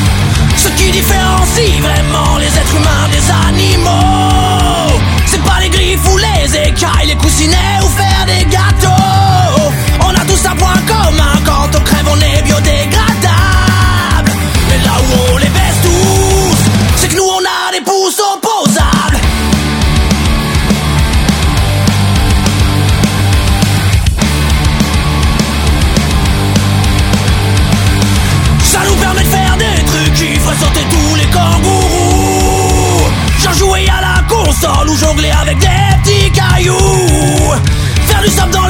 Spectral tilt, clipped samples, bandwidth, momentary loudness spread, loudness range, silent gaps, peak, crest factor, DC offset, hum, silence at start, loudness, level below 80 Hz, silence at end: -4.5 dB/octave; 0.2%; 17.5 kHz; 3 LU; 2 LU; none; 0 dBFS; 8 dB; under 0.1%; none; 0 s; -9 LUFS; -14 dBFS; 0 s